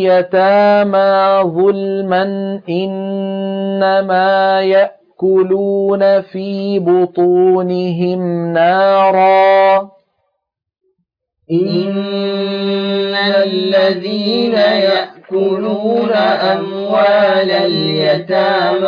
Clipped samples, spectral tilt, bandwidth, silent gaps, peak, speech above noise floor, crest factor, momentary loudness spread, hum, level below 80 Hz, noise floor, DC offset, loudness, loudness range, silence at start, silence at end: under 0.1%; -8 dB/octave; 5.2 kHz; none; -2 dBFS; 62 dB; 10 dB; 8 LU; none; -64 dBFS; -74 dBFS; under 0.1%; -13 LUFS; 3 LU; 0 s; 0 s